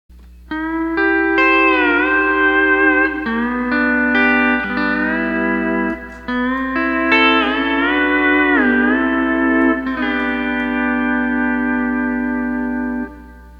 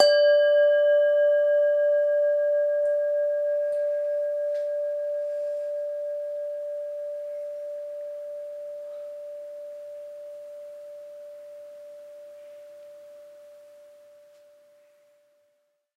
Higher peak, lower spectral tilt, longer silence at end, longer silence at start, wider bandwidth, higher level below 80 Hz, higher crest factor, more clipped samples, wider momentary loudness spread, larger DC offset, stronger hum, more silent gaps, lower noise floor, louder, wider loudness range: first, 0 dBFS vs -4 dBFS; first, -6.5 dB/octave vs 0 dB/octave; second, 0 s vs 2.3 s; first, 0.15 s vs 0 s; second, 5.8 kHz vs 8.4 kHz; first, -40 dBFS vs -90 dBFS; second, 16 dB vs 22 dB; neither; second, 8 LU vs 24 LU; neither; neither; neither; second, -37 dBFS vs -72 dBFS; first, -15 LUFS vs -25 LUFS; second, 4 LU vs 23 LU